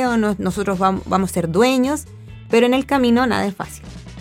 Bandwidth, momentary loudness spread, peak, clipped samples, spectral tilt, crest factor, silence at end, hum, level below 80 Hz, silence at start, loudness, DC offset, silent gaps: 16.5 kHz; 16 LU; -2 dBFS; under 0.1%; -5.5 dB/octave; 16 dB; 0 s; none; -44 dBFS; 0 s; -18 LUFS; under 0.1%; none